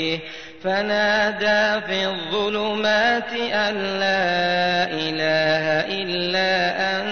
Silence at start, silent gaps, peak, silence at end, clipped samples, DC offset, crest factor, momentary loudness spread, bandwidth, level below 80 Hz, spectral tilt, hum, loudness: 0 s; none; -6 dBFS; 0 s; under 0.1%; 0.5%; 16 dB; 5 LU; 6.6 kHz; -56 dBFS; -4 dB/octave; none; -20 LUFS